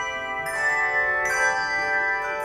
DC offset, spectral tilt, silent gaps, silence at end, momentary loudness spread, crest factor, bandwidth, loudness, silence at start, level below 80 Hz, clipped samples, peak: under 0.1%; -1.5 dB/octave; none; 0 s; 6 LU; 14 dB; over 20 kHz; -22 LUFS; 0 s; -54 dBFS; under 0.1%; -10 dBFS